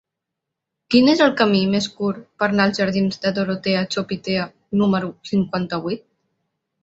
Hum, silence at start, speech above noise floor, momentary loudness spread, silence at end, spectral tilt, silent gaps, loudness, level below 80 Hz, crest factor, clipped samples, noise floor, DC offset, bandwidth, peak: none; 0.9 s; 63 dB; 9 LU; 0.85 s; -6 dB/octave; none; -20 LUFS; -58 dBFS; 18 dB; under 0.1%; -82 dBFS; under 0.1%; 8 kHz; -2 dBFS